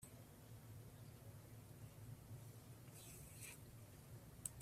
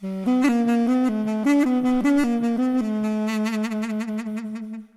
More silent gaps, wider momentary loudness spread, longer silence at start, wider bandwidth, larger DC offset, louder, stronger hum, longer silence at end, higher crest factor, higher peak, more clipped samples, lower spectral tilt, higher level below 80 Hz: neither; second, 5 LU vs 9 LU; about the same, 0 s vs 0 s; first, 15.5 kHz vs 14 kHz; neither; second, -58 LUFS vs -22 LUFS; neither; about the same, 0 s vs 0.1 s; first, 36 dB vs 14 dB; second, -20 dBFS vs -6 dBFS; neither; second, -4 dB/octave vs -6 dB/octave; second, -72 dBFS vs -58 dBFS